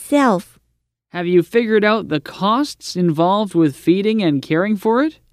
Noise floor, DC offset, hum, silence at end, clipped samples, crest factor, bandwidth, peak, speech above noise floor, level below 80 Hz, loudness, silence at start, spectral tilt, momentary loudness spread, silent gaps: -68 dBFS; under 0.1%; none; 0.2 s; under 0.1%; 14 dB; 15 kHz; -2 dBFS; 52 dB; -58 dBFS; -17 LUFS; 0 s; -6 dB/octave; 6 LU; none